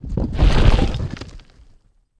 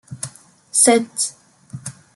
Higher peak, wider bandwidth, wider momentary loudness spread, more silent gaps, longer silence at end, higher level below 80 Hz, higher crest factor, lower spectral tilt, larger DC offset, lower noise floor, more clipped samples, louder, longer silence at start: about the same, 0 dBFS vs 0 dBFS; second, 9.4 kHz vs 12 kHz; second, 18 LU vs 21 LU; neither; first, 0.8 s vs 0.25 s; first, -20 dBFS vs -66 dBFS; about the same, 18 dB vs 22 dB; first, -7 dB/octave vs -2.5 dB/octave; neither; first, -53 dBFS vs -40 dBFS; neither; second, -19 LUFS vs -16 LUFS; about the same, 0 s vs 0.1 s